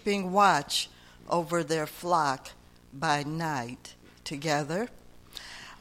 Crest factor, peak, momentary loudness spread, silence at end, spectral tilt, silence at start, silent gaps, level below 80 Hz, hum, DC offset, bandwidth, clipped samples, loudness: 22 dB; -8 dBFS; 21 LU; 0.05 s; -4 dB/octave; 0.05 s; none; -60 dBFS; 60 Hz at -60 dBFS; under 0.1%; 16.5 kHz; under 0.1%; -29 LUFS